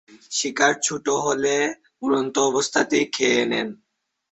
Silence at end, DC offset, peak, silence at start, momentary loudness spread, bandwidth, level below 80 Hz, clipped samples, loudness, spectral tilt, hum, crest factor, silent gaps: 0.55 s; under 0.1%; -4 dBFS; 0.1 s; 7 LU; 8.2 kHz; -66 dBFS; under 0.1%; -22 LUFS; -2.5 dB/octave; none; 20 dB; none